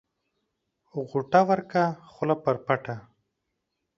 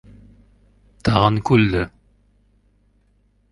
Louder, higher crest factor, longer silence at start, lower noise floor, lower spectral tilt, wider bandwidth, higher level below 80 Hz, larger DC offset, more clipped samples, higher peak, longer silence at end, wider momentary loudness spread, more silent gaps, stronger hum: second, -26 LUFS vs -18 LUFS; about the same, 24 dB vs 22 dB; about the same, 0.95 s vs 1.05 s; first, -81 dBFS vs -60 dBFS; about the same, -7.5 dB/octave vs -7.5 dB/octave; second, 7.4 kHz vs 11 kHz; second, -68 dBFS vs -40 dBFS; neither; neither; second, -4 dBFS vs 0 dBFS; second, 0.95 s vs 1.65 s; first, 16 LU vs 9 LU; neither; second, none vs 50 Hz at -40 dBFS